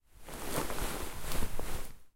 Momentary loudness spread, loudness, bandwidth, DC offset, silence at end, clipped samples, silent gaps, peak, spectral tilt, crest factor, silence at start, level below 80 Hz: 8 LU; -39 LUFS; 16.5 kHz; under 0.1%; 0.05 s; under 0.1%; none; -18 dBFS; -3.5 dB/octave; 16 dB; 0.2 s; -40 dBFS